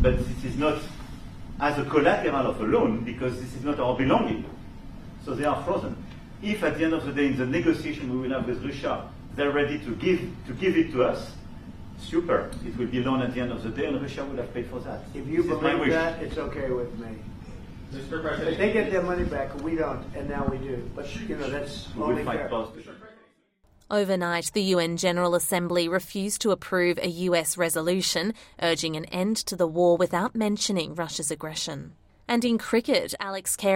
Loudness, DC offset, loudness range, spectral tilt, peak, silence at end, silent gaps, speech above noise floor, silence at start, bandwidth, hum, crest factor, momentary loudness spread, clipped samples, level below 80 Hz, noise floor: -27 LUFS; under 0.1%; 5 LU; -4.5 dB/octave; -6 dBFS; 0 s; none; 37 dB; 0 s; 16 kHz; none; 20 dB; 15 LU; under 0.1%; -44 dBFS; -63 dBFS